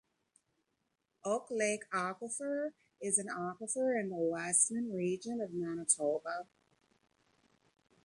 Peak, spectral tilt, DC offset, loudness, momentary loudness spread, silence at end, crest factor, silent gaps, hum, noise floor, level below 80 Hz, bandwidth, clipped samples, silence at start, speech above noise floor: -14 dBFS; -3.5 dB/octave; under 0.1%; -35 LUFS; 10 LU; 1.6 s; 24 dB; none; none; -83 dBFS; -82 dBFS; 11.5 kHz; under 0.1%; 1.25 s; 48 dB